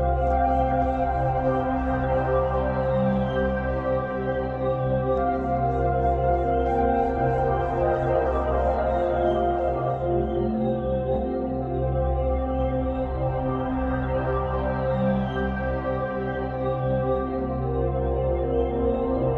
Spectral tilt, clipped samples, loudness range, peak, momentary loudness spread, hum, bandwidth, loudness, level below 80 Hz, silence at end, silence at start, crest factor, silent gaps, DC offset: -10 dB/octave; under 0.1%; 3 LU; -10 dBFS; 4 LU; none; 4.9 kHz; -25 LUFS; -32 dBFS; 0 s; 0 s; 14 dB; none; under 0.1%